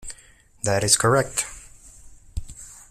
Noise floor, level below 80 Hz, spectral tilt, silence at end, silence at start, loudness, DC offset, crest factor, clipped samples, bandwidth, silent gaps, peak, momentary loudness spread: -52 dBFS; -42 dBFS; -3 dB/octave; 0.1 s; 0 s; -21 LUFS; under 0.1%; 24 dB; under 0.1%; 16 kHz; none; -2 dBFS; 24 LU